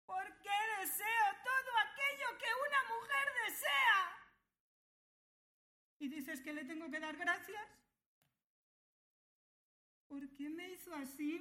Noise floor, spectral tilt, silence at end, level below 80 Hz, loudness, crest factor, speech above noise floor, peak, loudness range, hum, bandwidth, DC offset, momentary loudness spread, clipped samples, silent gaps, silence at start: -61 dBFS; -0.5 dB/octave; 0 s; -84 dBFS; -38 LUFS; 22 dB; 16 dB; -20 dBFS; 16 LU; none; 16.5 kHz; under 0.1%; 15 LU; under 0.1%; 4.60-6.00 s, 8.06-8.22 s, 8.44-10.10 s; 0.1 s